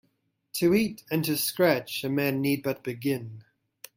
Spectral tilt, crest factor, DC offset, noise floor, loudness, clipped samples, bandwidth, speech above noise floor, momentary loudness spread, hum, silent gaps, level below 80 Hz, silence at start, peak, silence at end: -5 dB/octave; 20 dB; under 0.1%; -73 dBFS; -27 LUFS; under 0.1%; 16.5 kHz; 47 dB; 8 LU; none; none; -66 dBFS; 0.55 s; -8 dBFS; 0.55 s